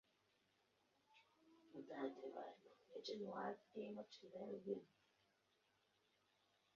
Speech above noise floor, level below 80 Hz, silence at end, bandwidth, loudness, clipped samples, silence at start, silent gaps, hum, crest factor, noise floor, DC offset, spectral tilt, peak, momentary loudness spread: 31 dB; under -90 dBFS; 1.9 s; 7 kHz; -53 LUFS; under 0.1%; 1.1 s; none; 50 Hz at -85 dBFS; 22 dB; -83 dBFS; under 0.1%; -4 dB/octave; -34 dBFS; 11 LU